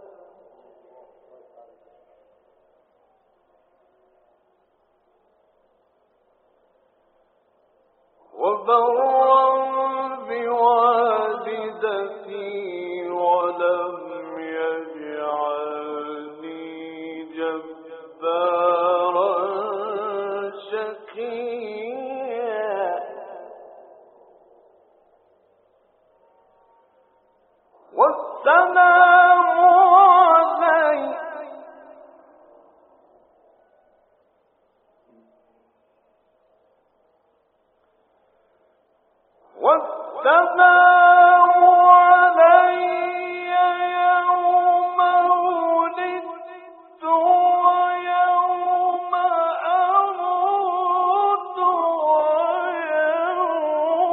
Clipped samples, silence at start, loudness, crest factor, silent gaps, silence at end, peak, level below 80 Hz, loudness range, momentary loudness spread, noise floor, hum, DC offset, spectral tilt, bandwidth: under 0.1%; 8.35 s; -18 LUFS; 20 dB; none; 0 s; 0 dBFS; -80 dBFS; 15 LU; 20 LU; -65 dBFS; none; under 0.1%; 0 dB/octave; 4.2 kHz